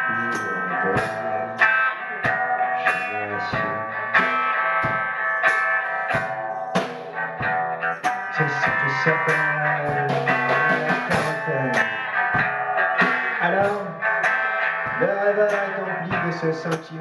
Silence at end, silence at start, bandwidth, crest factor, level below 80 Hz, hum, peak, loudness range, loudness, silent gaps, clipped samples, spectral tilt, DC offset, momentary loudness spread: 0 s; 0 s; 11.5 kHz; 16 dB; -58 dBFS; none; -6 dBFS; 2 LU; -22 LUFS; none; under 0.1%; -5.5 dB/octave; under 0.1%; 6 LU